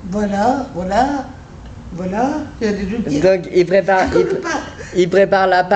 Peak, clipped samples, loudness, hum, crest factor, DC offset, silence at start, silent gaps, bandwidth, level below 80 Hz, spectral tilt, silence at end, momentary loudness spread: -2 dBFS; under 0.1%; -16 LUFS; none; 14 dB; under 0.1%; 0 s; none; 8.6 kHz; -38 dBFS; -6 dB/octave; 0 s; 13 LU